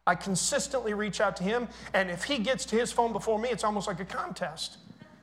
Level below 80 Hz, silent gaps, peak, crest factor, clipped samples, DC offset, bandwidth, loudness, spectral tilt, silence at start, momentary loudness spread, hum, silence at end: -56 dBFS; none; -10 dBFS; 20 dB; under 0.1%; under 0.1%; 16 kHz; -30 LUFS; -3.5 dB/octave; 0.05 s; 7 LU; none; 0.05 s